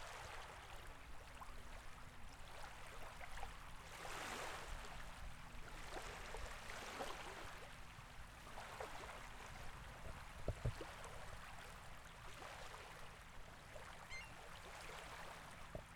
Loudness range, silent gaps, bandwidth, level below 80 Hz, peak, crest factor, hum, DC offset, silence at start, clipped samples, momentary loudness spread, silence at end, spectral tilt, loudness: 4 LU; none; 19 kHz; -58 dBFS; -30 dBFS; 22 dB; none; under 0.1%; 0 s; under 0.1%; 9 LU; 0 s; -3.5 dB/octave; -54 LUFS